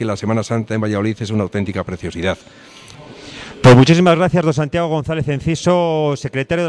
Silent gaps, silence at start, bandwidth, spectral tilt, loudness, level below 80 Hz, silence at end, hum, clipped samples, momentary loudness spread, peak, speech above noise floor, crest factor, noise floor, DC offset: none; 0 s; 10.5 kHz; -6.5 dB/octave; -16 LUFS; -42 dBFS; 0 s; none; under 0.1%; 15 LU; -2 dBFS; 22 dB; 14 dB; -38 dBFS; under 0.1%